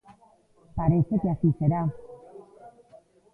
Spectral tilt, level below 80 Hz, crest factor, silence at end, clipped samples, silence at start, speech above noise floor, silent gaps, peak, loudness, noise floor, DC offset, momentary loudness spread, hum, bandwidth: -12.5 dB/octave; -48 dBFS; 18 dB; 0.65 s; under 0.1%; 0.75 s; 36 dB; none; -10 dBFS; -25 LUFS; -60 dBFS; under 0.1%; 23 LU; none; 2.6 kHz